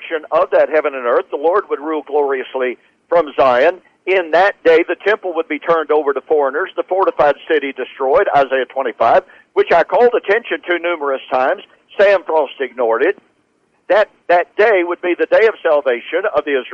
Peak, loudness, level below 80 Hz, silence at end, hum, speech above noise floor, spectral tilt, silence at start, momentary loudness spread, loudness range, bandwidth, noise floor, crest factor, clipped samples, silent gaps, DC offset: -4 dBFS; -15 LUFS; -56 dBFS; 0 s; none; 46 dB; -5.5 dB/octave; 0 s; 8 LU; 2 LU; 6.8 kHz; -60 dBFS; 12 dB; under 0.1%; none; under 0.1%